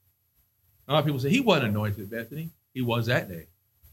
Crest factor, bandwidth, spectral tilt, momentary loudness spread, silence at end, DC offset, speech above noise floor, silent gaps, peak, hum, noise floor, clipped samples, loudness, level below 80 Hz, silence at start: 22 dB; 17 kHz; -6 dB/octave; 16 LU; 0.5 s; under 0.1%; 43 dB; none; -6 dBFS; none; -69 dBFS; under 0.1%; -26 LUFS; -62 dBFS; 0.9 s